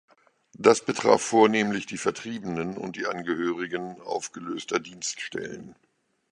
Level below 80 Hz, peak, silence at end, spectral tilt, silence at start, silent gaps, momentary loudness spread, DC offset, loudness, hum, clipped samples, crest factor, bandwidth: -66 dBFS; -2 dBFS; 0.6 s; -4 dB/octave; 0.6 s; none; 14 LU; under 0.1%; -26 LUFS; none; under 0.1%; 24 dB; 11 kHz